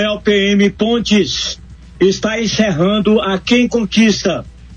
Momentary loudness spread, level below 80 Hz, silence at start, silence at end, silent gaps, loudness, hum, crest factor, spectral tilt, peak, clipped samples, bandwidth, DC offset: 6 LU; -38 dBFS; 0 s; 0 s; none; -14 LUFS; none; 12 dB; -4.5 dB/octave; -2 dBFS; under 0.1%; 9 kHz; under 0.1%